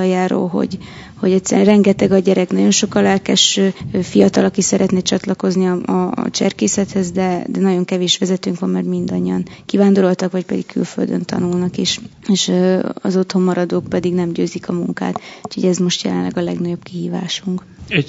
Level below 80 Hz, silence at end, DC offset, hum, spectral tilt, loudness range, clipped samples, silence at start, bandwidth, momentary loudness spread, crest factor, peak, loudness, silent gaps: -52 dBFS; 0 s; under 0.1%; none; -5 dB/octave; 5 LU; under 0.1%; 0 s; 8 kHz; 9 LU; 16 dB; 0 dBFS; -16 LUFS; none